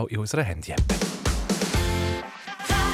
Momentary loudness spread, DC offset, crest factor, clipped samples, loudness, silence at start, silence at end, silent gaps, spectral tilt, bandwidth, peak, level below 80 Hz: 6 LU; under 0.1%; 16 dB; under 0.1%; -26 LUFS; 0 s; 0 s; none; -4.5 dB/octave; 16.5 kHz; -10 dBFS; -32 dBFS